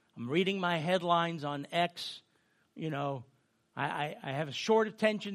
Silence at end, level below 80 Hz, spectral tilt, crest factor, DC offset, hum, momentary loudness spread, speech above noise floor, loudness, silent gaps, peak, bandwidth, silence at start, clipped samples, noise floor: 0 s; -80 dBFS; -5.5 dB/octave; 20 dB; under 0.1%; none; 13 LU; 40 dB; -33 LUFS; none; -12 dBFS; 14 kHz; 0.15 s; under 0.1%; -72 dBFS